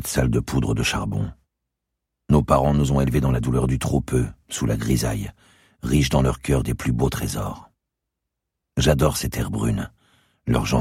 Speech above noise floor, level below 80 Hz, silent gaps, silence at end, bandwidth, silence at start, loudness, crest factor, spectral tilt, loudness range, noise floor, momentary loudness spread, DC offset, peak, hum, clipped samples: 61 dB; -32 dBFS; none; 0 s; 16.5 kHz; 0 s; -22 LUFS; 18 dB; -6 dB/octave; 3 LU; -82 dBFS; 11 LU; under 0.1%; -4 dBFS; none; under 0.1%